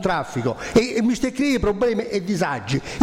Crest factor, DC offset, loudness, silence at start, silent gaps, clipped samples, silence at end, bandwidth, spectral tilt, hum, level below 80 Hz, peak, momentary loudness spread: 16 dB; under 0.1%; -22 LUFS; 0 s; none; under 0.1%; 0 s; 15.5 kHz; -5.5 dB/octave; none; -40 dBFS; -6 dBFS; 6 LU